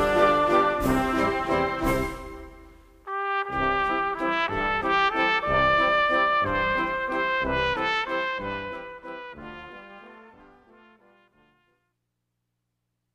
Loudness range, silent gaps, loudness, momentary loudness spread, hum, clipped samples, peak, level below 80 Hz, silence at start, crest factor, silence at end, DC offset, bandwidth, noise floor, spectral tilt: 13 LU; none; -24 LUFS; 19 LU; 60 Hz at -70 dBFS; under 0.1%; -8 dBFS; -44 dBFS; 0 s; 18 dB; 2.85 s; under 0.1%; 15.5 kHz; -79 dBFS; -5 dB/octave